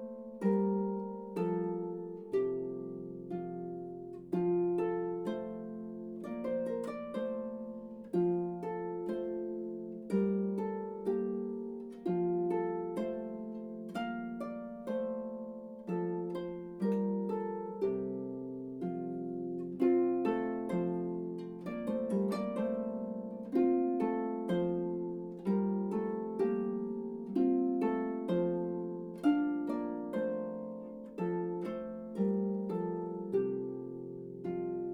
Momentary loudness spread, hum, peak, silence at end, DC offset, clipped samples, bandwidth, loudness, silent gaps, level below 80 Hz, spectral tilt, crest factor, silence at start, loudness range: 11 LU; none; -18 dBFS; 0 s; under 0.1%; under 0.1%; 11 kHz; -36 LUFS; none; -70 dBFS; -9.5 dB/octave; 18 dB; 0 s; 4 LU